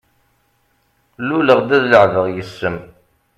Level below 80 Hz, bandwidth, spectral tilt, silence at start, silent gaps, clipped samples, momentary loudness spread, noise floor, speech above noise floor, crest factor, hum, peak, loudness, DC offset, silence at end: -54 dBFS; 11.5 kHz; -6.5 dB/octave; 1.2 s; none; under 0.1%; 13 LU; -62 dBFS; 47 dB; 18 dB; none; 0 dBFS; -15 LUFS; under 0.1%; 0.5 s